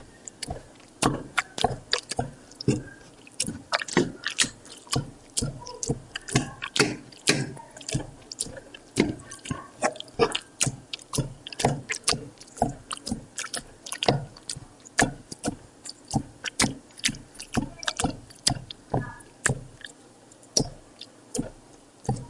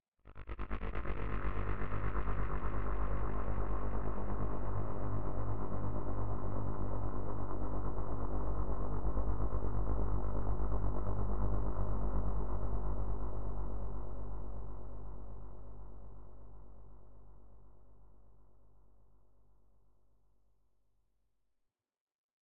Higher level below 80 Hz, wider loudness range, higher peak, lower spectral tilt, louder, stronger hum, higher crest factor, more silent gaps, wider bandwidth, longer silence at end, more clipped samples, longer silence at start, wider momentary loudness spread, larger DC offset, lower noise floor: second, -48 dBFS vs -40 dBFS; second, 2 LU vs 16 LU; first, -2 dBFS vs -20 dBFS; second, -3 dB/octave vs -9 dB/octave; first, -29 LUFS vs -41 LUFS; neither; first, 30 dB vs 14 dB; second, none vs 0.08-0.12 s, 22.01-22.07 s, 22.14-22.29 s; first, 11.5 kHz vs 3.6 kHz; second, 0 s vs 0.2 s; neither; about the same, 0 s vs 0 s; about the same, 14 LU vs 15 LU; second, under 0.1% vs 3%; second, -52 dBFS vs -83 dBFS